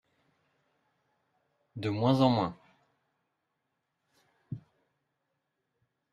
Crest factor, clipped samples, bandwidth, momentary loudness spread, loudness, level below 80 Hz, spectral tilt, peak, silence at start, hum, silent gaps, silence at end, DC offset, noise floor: 24 dB; under 0.1%; 11.5 kHz; 20 LU; -29 LUFS; -72 dBFS; -8 dB/octave; -12 dBFS; 1.75 s; none; none; 1.55 s; under 0.1%; -82 dBFS